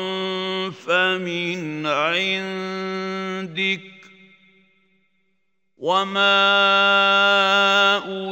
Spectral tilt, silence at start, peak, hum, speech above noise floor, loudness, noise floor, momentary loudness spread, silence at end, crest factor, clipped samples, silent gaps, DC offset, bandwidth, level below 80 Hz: -3.5 dB/octave; 0 s; -4 dBFS; none; 55 dB; -19 LUFS; -74 dBFS; 12 LU; 0 s; 18 dB; under 0.1%; none; under 0.1%; 16 kHz; -80 dBFS